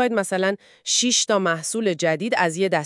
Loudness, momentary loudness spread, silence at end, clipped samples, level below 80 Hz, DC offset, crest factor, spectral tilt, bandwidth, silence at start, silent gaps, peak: -21 LUFS; 6 LU; 0 s; under 0.1%; -78 dBFS; under 0.1%; 16 dB; -2.5 dB/octave; 12 kHz; 0 s; none; -6 dBFS